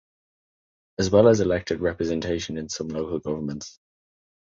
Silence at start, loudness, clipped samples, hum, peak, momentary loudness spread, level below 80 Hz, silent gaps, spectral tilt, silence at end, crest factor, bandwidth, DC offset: 1 s; -24 LUFS; under 0.1%; none; -4 dBFS; 15 LU; -48 dBFS; none; -5.5 dB/octave; 0.9 s; 20 dB; 7.8 kHz; under 0.1%